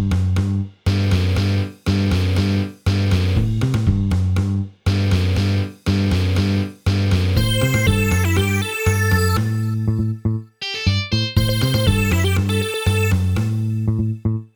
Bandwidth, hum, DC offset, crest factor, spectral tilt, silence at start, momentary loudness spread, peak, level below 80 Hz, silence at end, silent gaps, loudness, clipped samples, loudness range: over 20 kHz; none; under 0.1%; 14 dB; -6 dB/octave; 0 s; 5 LU; -4 dBFS; -32 dBFS; 0.1 s; none; -19 LUFS; under 0.1%; 1 LU